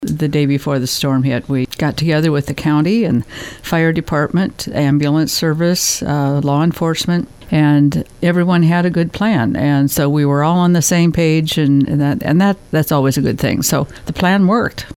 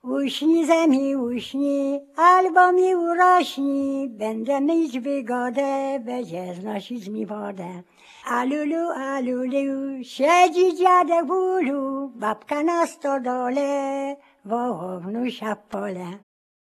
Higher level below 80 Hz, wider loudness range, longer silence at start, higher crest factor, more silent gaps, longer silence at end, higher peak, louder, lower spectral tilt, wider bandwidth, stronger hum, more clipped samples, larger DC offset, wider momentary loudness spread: first, -40 dBFS vs -74 dBFS; second, 2 LU vs 9 LU; about the same, 0 s vs 0.05 s; about the same, 14 dB vs 18 dB; neither; second, 0.05 s vs 0.5 s; about the same, -2 dBFS vs -4 dBFS; first, -15 LUFS vs -22 LUFS; about the same, -5.5 dB/octave vs -4.5 dB/octave; first, 17.5 kHz vs 14 kHz; neither; neither; neither; second, 5 LU vs 14 LU